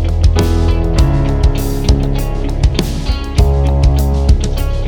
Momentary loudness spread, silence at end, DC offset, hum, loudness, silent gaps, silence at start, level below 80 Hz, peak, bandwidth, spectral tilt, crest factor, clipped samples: 5 LU; 0 s; under 0.1%; none; -14 LUFS; none; 0 s; -14 dBFS; 0 dBFS; 18.5 kHz; -6.5 dB/octave; 12 dB; under 0.1%